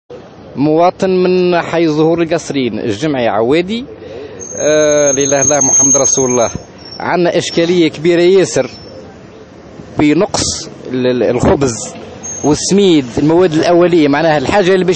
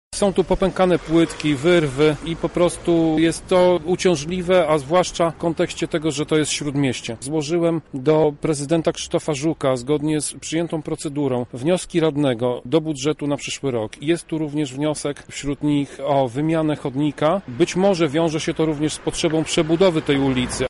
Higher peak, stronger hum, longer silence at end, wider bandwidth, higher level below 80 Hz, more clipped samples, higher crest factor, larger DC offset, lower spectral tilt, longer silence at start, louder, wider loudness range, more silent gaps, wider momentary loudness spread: first, 0 dBFS vs -6 dBFS; neither; about the same, 0 s vs 0 s; second, 8.8 kHz vs 11.5 kHz; about the same, -40 dBFS vs -44 dBFS; neither; about the same, 12 dB vs 14 dB; neither; second, -4 dB/octave vs -5.5 dB/octave; about the same, 0.1 s vs 0.1 s; first, -11 LUFS vs -20 LUFS; about the same, 5 LU vs 4 LU; neither; first, 14 LU vs 7 LU